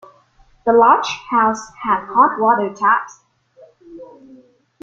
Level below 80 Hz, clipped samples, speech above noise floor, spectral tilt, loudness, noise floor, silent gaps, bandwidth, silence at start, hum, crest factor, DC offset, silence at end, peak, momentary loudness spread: -58 dBFS; under 0.1%; 37 dB; -4 dB/octave; -16 LUFS; -53 dBFS; none; 7.8 kHz; 0.65 s; none; 16 dB; under 0.1%; 0.75 s; -2 dBFS; 9 LU